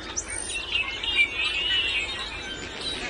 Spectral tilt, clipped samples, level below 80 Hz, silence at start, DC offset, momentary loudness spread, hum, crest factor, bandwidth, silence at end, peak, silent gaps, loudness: -0.5 dB/octave; under 0.1%; -46 dBFS; 0 s; under 0.1%; 10 LU; none; 18 dB; 11.5 kHz; 0 s; -10 dBFS; none; -25 LUFS